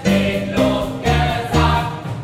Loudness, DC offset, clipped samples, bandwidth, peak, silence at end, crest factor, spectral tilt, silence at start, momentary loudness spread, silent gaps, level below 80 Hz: -18 LUFS; under 0.1%; under 0.1%; 16 kHz; -2 dBFS; 0 s; 14 dB; -6 dB/octave; 0 s; 4 LU; none; -28 dBFS